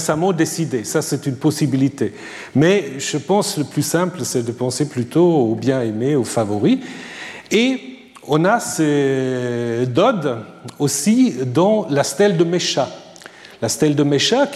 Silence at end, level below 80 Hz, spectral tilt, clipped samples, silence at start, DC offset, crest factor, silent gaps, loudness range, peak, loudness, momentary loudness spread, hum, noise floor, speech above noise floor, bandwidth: 0 s; -62 dBFS; -5 dB/octave; under 0.1%; 0 s; under 0.1%; 14 dB; none; 2 LU; -4 dBFS; -18 LUFS; 11 LU; none; -40 dBFS; 23 dB; 15 kHz